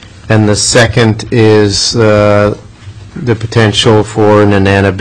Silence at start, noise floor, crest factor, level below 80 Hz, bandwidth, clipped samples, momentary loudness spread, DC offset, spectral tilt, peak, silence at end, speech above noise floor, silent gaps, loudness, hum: 0 s; -29 dBFS; 8 dB; -34 dBFS; 11 kHz; 0.3%; 8 LU; 1%; -5 dB/octave; 0 dBFS; 0 s; 22 dB; none; -8 LUFS; none